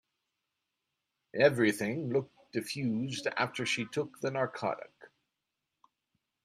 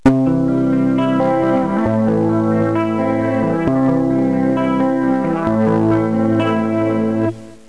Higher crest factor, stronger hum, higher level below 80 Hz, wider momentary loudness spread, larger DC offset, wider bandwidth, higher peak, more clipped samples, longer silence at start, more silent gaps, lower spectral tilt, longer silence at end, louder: first, 24 dB vs 14 dB; neither; second, -76 dBFS vs -42 dBFS; first, 12 LU vs 2 LU; second, under 0.1% vs 0.7%; first, 15 kHz vs 11 kHz; second, -12 dBFS vs -2 dBFS; neither; first, 1.35 s vs 0.05 s; neither; second, -5 dB/octave vs -9 dB/octave; first, 1.35 s vs 0.15 s; second, -32 LUFS vs -16 LUFS